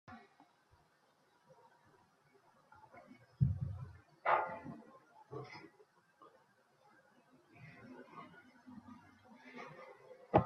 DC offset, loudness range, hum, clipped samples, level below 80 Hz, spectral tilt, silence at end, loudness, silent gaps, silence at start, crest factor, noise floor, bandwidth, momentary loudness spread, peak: under 0.1%; 18 LU; none; under 0.1%; -66 dBFS; -8.5 dB/octave; 0 s; -41 LUFS; none; 0.1 s; 30 dB; -73 dBFS; 6.6 kHz; 27 LU; -14 dBFS